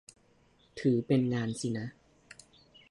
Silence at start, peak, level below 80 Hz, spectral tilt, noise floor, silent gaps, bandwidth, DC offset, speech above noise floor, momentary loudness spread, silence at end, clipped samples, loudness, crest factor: 0.75 s; -16 dBFS; -68 dBFS; -6.5 dB/octave; -66 dBFS; none; 11.5 kHz; under 0.1%; 36 dB; 25 LU; 0.55 s; under 0.1%; -31 LUFS; 18 dB